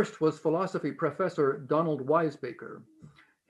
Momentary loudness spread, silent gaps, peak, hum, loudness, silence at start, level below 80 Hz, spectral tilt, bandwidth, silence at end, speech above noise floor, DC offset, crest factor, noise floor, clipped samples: 14 LU; none; -12 dBFS; none; -29 LUFS; 0 s; -76 dBFS; -7.5 dB/octave; 10.5 kHz; 0.4 s; 27 dB; under 0.1%; 18 dB; -56 dBFS; under 0.1%